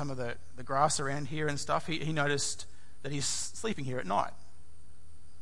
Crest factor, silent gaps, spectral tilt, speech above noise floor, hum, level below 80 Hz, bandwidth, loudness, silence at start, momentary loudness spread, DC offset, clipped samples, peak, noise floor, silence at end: 22 dB; none; -3.5 dB/octave; 25 dB; none; -62 dBFS; 11.5 kHz; -33 LUFS; 0 s; 11 LU; 2%; under 0.1%; -12 dBFS; -58 dBFS; 0.25 s